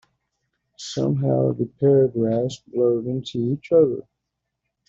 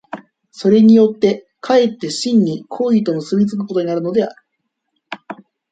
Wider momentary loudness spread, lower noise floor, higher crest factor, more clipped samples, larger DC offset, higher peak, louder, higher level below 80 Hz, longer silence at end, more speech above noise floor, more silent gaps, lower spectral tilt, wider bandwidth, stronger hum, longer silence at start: second, 9 LU vs 23 LU; first, -80 dBFS vs -73 dBFS; about the same, 16 dB vs 14 dB; neither; neither; second, -6 dBFS vs -2 dBFS; second, -21 LUFS vs -15 LUFS; about the same, -62 dBFS vs -62 dBFS; first, 0.85 s vs 0.4 s; about the same, 60 dB vs 59 dB; neither; first, -8 dB/octave vs -6.5 dB/octave; second, 7.8 kHz vs 9 kHz; neither; first, 0.8 s vs 0.15 s